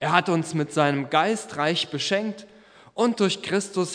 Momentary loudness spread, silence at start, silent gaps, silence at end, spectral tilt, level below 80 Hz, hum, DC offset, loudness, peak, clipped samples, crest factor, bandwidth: 5 LU; 0 s; none; 0 s; -4.5 dB/octave; -72 dBFS; none; under 0.1%; -24 LUFS; 0 dBFS; under 0.1%; 24 dB; 11 kHz